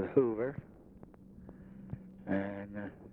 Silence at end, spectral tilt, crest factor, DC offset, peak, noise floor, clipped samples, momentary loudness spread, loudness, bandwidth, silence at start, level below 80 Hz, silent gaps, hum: 0 s; -10.5 dB/octave; 24 dB; under 0.1%; -14 dBFS; -55 dBFS; under 0.1%; 24 LU; -37 LUFS; 4 kHz; 0 s; -64 dBFS; none; none